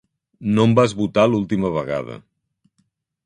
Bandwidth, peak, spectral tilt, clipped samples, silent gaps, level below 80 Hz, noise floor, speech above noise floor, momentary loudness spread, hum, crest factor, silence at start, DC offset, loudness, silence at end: 10 kHz; -2 dBFS; -7 dB/octave; under 0.1%; none; -52 dBFS; -68 dBFS; 50 dB; 14 LU; none; 20 dB; 0.4 s; under 0.1%; -19 LUFS; 1.05 s